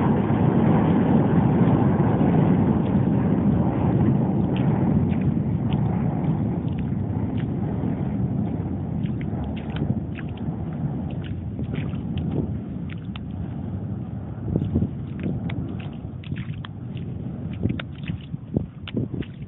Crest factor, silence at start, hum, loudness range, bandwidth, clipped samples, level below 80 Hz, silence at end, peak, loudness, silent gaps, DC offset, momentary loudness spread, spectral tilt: 16 dB; 0 s; none; 10 LU; 4 kHz; under 0.1%; -42 dBFS; 0 s; -6 dBFS; -24 LUFS; none; under 0.1%; 13 LU; -13 dB/octave